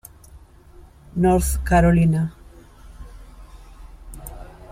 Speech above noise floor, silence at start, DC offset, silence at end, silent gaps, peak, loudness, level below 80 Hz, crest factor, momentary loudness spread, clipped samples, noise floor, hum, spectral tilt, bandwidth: 29 dB; 0.35 s; under 0.1%; 0.3 s; none; -4 dBFS; -19 LUFS; -32 dBFS; 18 dB; 23 LU; under 0.1%; -46 dBFS; none; -7 dB/octave; 16 kHz